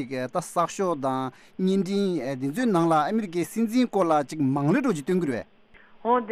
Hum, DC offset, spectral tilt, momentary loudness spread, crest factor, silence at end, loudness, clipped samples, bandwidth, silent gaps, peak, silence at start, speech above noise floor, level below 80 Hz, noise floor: none; under 0.1%; -6.5 dB/octave; 7 LU; 14 dB; 0 s; -25 LUFS; under 0.1%; 15 kHz; none; -10 dBFS; 0 s; 27 dB; -66 dBFS; -52 dBFS